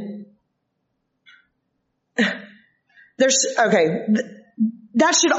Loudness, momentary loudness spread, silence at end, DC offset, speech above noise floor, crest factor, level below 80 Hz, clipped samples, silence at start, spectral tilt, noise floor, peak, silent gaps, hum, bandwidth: -20 LUFS; 17 LU; 0 s; under 0.1%; 56 dB; 18 dB; -76 dBFS; under 0.1%; 0 s; -2.5 dB/octave; -74 dBFS; -4 dBFS; none; none; 8 kHz